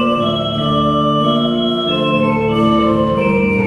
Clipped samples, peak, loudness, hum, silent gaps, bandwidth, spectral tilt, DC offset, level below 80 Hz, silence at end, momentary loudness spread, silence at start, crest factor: under 0.1%; -2 dBFS; -14 LUFS; none; none; 10.5 kHz; -7.5 dB/octave; under 0.1%; -38 dBFS; 0 s; 3 LU; 0 s; 12 dB